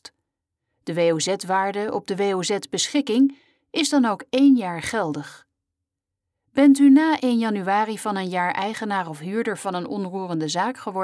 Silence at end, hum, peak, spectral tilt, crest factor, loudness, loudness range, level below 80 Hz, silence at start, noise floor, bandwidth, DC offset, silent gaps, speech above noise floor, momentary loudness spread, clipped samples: 0 s; none; -6 dBFS; -4.5 dB/octave; 16 dB; -22 LUFS; 5 LU; -66 dBFS; 0.85 s; -84 dBFS; 11 kHz; under 0.1%; none; 63 dB; 11 LU; under 0.1%